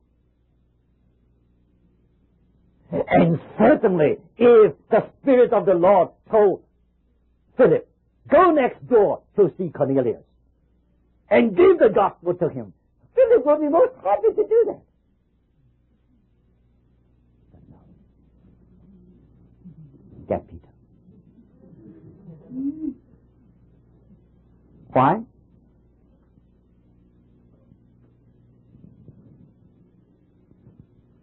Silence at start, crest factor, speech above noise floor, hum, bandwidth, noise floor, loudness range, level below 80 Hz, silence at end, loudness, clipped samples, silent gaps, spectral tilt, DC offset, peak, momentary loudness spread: 2.9 s; 18 dB; 46 dB; none; 4.2 kHz; -64 dBFS; 19 LU; -56 dBFS; 6 s; -19 LUFS; under 0.1%; none; -12 dB/octave; under 0.1%; -4 dBFS; 14 LU